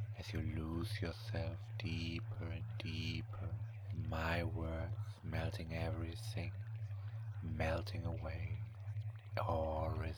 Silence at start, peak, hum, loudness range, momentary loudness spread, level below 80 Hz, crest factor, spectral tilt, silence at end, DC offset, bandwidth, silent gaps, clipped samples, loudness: 0 s; -22 dBFS; none; 1 LU; 7 LU; -52 dBFS; 20 dB; -7 dB/octave; 0 s; under 0.1%; 16 kHz; none; under 0.1%; -43 LUFS